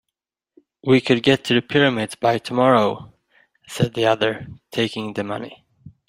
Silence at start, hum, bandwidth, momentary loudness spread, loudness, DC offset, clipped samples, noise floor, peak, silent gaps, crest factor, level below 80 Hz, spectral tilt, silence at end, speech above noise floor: 0.85 s; none; 16 kHz; 14 LU; -20 LUFS; under 0.1%; under 0.1%; -83 dBFS; -2 dBFS; none; 20 dB; -58 dBFS; -5.5 dB/octave; 0.2 s; 64 dB